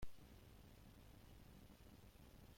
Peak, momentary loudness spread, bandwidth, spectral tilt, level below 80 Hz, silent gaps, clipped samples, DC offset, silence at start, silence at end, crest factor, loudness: -38 dBFS; 1 LU; 16.5 kHz; -5.5 dB/octave; -66 dBFS; none; under 0.1%; under 0.1%; 0 s; 0 s; 20 dB; -65 LUFS